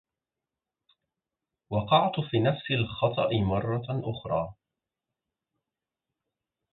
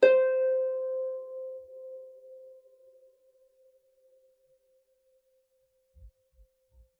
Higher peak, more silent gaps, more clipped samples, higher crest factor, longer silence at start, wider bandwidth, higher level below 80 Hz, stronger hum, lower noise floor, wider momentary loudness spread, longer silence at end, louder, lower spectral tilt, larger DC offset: about the same, -8 dBFS vs -8 dBFS; neither; neither; about the same, 22 dB vs 26 dB; first, 1.7 s vs 0 s; second, 4.3 kHz vs 5 kHz; first, -54 dBFS vs -66 dBFS; neither; first, -89 dBFS vs -73 dBFS; second, 9 LU vs 26 LU; first, 2.2 s vs 0.9 s; about the same, -28 LUFS vs -29 LUFS; first, -10.5 dB/octave vs -4.5 dB/octave; neither